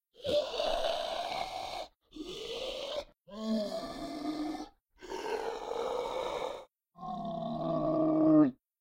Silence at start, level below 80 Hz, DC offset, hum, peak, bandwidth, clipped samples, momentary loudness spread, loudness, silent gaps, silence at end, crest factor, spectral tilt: 0.2 s; -56 dBFS; under 0.1%; none; -14 dBFS; 15 kHz; under 0.1%; 16 LU; -34 LUFS; none; 0.25 s; 20 dB; -5.5 dB/octave